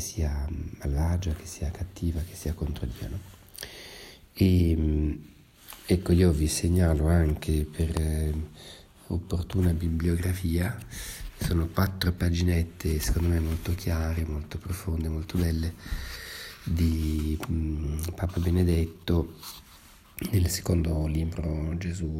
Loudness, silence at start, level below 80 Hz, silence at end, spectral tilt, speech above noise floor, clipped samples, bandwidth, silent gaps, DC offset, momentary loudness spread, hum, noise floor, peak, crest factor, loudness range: -28 LUFS; 0 s; -34 dBFS; 0 s; -6.5 dB/octave; 26 dB; under 0.1%; 16 kHz; none; under 0.1%; 15 LU; none; -52 dBFS; -10 dBFS; 18 dB; 6 LU